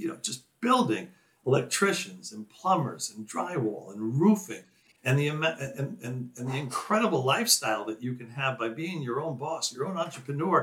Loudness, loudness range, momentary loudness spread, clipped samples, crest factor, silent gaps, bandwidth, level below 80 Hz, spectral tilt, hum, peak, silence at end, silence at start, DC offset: -29 LUFS; 2 LU; 12 LU; under 0.1%; 22 dB; none; 17 kHz; -80 dBFS; -4.5 dB/octave; none; -8 dBFS; 0 s; 0 s; under 0.1%